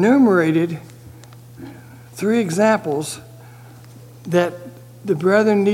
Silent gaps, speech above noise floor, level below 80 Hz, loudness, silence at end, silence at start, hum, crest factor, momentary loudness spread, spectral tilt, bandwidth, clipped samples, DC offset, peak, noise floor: none; 24 dB; -60 dBFS; -18 LUFS; 0 s; 0 s; none; 18 dB; 24 LU; -6 dB/octave; 17 kHz; under 0.1%; under 0.1%; -2 dBFS; -41 dBFS